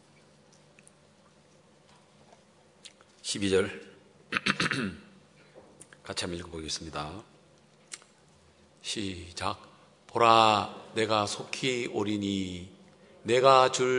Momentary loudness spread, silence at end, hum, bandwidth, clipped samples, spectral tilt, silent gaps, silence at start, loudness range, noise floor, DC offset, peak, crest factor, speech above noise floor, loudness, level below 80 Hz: 24 LU; 0 s; none; 11 kHz; under 0.1%; -4 dB/octave; none; 2.85 s; 12 LU; -60 dBFS; under 0.1%; -4 dBFS; 26 dB; 33 dB; -28 LUFS; -66 dBFS